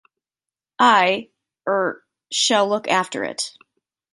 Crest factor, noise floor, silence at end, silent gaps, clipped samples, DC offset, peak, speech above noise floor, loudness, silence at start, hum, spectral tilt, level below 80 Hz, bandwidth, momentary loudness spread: 20 dB; -90 dBFS; 0.65 s; none; under 0.1%; under 0.1%; -2 dBFS; 70 dB; -19 LUFS; 0.8 s; none; -2 dB/octave; -72 dBFS; 11.5 kHz; 13 LU